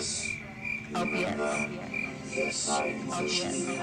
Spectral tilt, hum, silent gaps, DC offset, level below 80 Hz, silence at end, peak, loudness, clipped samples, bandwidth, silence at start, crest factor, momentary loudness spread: -3 dB/octave; none; none; under 0.1%; -60 dBFS; 0 s; -16 dBFS; -31 LUFS; under 0.1%; 15 kHz; 0 s; 16 dB; 6 LU